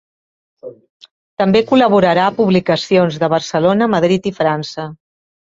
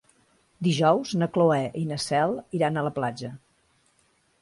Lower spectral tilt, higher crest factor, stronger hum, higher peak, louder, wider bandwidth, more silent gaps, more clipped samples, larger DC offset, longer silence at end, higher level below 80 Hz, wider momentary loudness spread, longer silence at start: about the same, -6.5 dB/octave vs -6 dB/octave; about the same, 16 dB vs 18 dB; neither; first, 0 dBFS vs -8 dBFS; first, -14 LUFS vs -25 LUFS; second, 7.8 kHz vs 11.5 kHz; first, 0.90-1.00 s, 1.11-1.37 s vs none; neither; neither; second, 0.55 s vs 1.05 s; first, -54 dBFS vs -64 dBFS; first, 11 LU vs 8 LU; about the same, 0.65 s vs 0.6 s